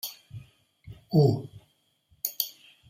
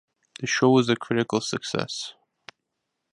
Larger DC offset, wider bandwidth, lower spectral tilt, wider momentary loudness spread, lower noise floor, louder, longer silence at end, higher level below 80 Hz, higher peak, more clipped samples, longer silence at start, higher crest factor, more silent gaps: neither; first, 16 kHz vs 11.5 kHz; first, -6.5 dB/octave vs -4.5 dB/octave; first, 24 LU vs 14 LU; second, -68 dBFS vs -81 dBFS; second, -28 LUFS vs -24 LUFS; second, 0.4 s vs 1 s; about the same, -64 dBFS vs -66 dBFS; about the same, -8 dBFS vs -6 dBFS; neither; second, 0.05 s vs 0.4 s; about the same, 24 dB vs 20 dB; neither